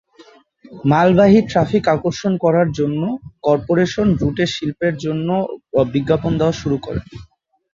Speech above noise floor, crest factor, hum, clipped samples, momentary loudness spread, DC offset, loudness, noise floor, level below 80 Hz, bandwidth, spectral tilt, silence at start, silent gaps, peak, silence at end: 31 dB; 16 dB; none; under 0.1%; 10 LU; under 0.1%; -17 LUFS; -48 dBFS; -42 dBFS; 7.6 kHz; -7 dB/octave; 0.2 s; none; -2 dBFS; 0.5 s